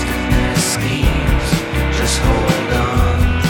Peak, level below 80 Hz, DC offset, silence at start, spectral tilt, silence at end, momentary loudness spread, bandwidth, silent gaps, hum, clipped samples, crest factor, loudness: 0 dBFS; -20 dBFS; under 0.1%; 0 s; -4.5 dB/octave; 0 s; 2 LU; 17.5 kHz; none; none; under 0.1%; 14 dB; -16 LUFS